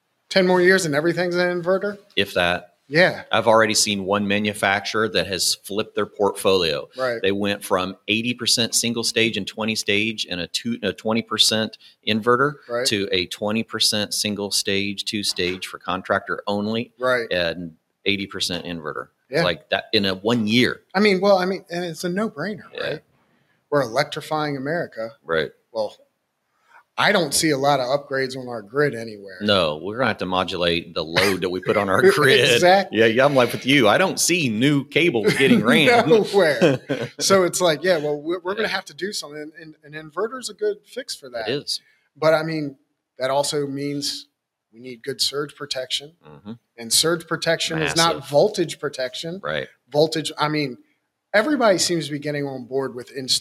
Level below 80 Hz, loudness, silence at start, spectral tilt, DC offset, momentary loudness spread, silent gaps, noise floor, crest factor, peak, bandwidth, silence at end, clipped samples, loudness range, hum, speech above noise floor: -60 dBFS; -20 LUFS; 0.3 s; -3.5 dB/octave; under 0.1%; 12 LU; none; -72 dBFS; 18 dB; -2 dBFS; 15.5 kHz; 0 s; under 0.1%; 9 LU; none; 51 dB